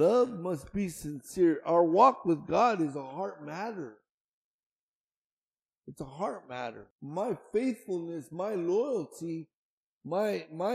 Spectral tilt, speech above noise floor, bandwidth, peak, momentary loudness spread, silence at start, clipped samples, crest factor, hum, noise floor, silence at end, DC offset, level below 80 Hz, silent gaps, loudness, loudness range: -6.5 dB/octave; over 60 dB; 15 kHz; -8 dBFS; 15 LU; 0 s; under 0.1%; 22 dB; none; under -90 dBFS; 0 s; under 0.1%; -66 dBFS; 4.09-5.10 s, 5.17-5.52 s, 5.62-5.69 s, 5.77-5.82 s, 6.91-6.99 s, 9.54-10.01 s; -31 LUFS; 15 LU